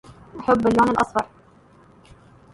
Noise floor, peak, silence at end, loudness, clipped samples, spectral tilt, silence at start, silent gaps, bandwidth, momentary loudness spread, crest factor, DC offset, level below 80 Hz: -52 dBFS; -4 dBFS; 1.3 s; -20 LUFS; under 0.1%; -6.5 dB/octave; 0.1 s; none; 11.5 kHz; 16 LU; 18 dB; under 0.1%; -50 dBFS